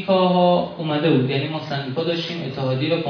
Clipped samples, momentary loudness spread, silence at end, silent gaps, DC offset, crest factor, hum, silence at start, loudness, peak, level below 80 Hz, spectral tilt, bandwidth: under 0.1%; 9 LU; 0 s; none; under 0.1%; 16 dB; none; 0 s; -21 LUFS; -4 dBFS; -62 dBFS; -8 dB/octave; 5.4 kHz